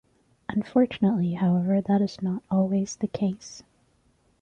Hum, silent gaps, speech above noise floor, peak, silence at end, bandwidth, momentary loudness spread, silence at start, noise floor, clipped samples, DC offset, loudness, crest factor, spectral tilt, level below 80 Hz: none; none; 41 dB; -10 dBFS; 0.8 s; 7.8 kHz; 13 LU; 0.5 s; -65 dBFS; under 0.1%; under 0.1%; -25 LUFS; 16 dB; -7.5 dB/octave; -62 dBFS